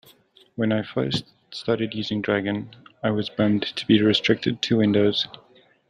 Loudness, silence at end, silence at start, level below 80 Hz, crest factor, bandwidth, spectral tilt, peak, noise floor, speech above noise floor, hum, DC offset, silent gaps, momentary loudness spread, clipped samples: -23 LUFS; 0.55 s; 0.6 s; -60 dBFS; 18 dB; 10 kHz; -6 dB/octave; -4 dBFS; -55 dBFS; 33 dB; none; under 0.1%; none; 11 LU; under 0.1%